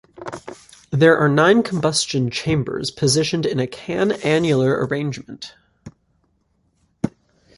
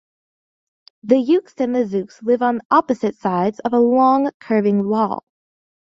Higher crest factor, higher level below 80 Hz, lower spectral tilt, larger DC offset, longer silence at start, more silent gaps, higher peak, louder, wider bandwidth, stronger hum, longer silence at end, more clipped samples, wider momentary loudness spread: about the same, 18 dB vs 16 dB; first, -52 dBFS vs -64 dBFS; second, -5 dB/octave vs -8 dB/octave; neither; second, 0.2 s vs 1.05 s; second, none vs 2.65-2.70 s, 4.34-4.40 s; about the same, -2 dBFS vs -2 dBFS; about the same, -19 LUFS vs -18 LUFS; first, 11.5 kHz vs 7.6 kHz; neither; second, 0.5 s vs 0.65 s; neither; first, 19 LU vs 8 LU